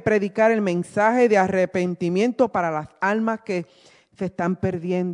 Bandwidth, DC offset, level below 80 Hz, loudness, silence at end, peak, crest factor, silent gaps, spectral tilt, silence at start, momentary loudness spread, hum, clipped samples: 11 kHz; under 0.1%; -60 dBFS; -22 LUFS; 0 s; -4 dBFS; 16 dB; none; -7 dB/octave; 0.05 s; 9 LU; none; under 0.1%